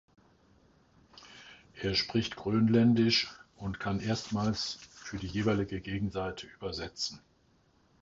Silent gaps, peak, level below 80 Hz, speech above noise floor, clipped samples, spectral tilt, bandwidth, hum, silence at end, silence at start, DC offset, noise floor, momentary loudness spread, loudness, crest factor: none; -14 dBFS; -56 dBFS; 37 dB; under 0.1%; -5.5 dB/octave; 7.8 kHz; none; 0.85 s; 1.2 s; under 0.1%; -68 dBFS; 18 LU; -31 LUFS; 18 dB